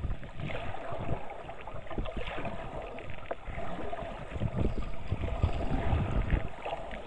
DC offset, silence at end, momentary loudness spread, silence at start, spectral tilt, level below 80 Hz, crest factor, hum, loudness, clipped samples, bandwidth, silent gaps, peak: under 0.1%; 0 s; 10 LU; 0 s; -8 dB/octave; -38 dBFS; 18 dB; none; -37 LUFS; under 0.1%; 9.2 kHz; none; -14 dBFS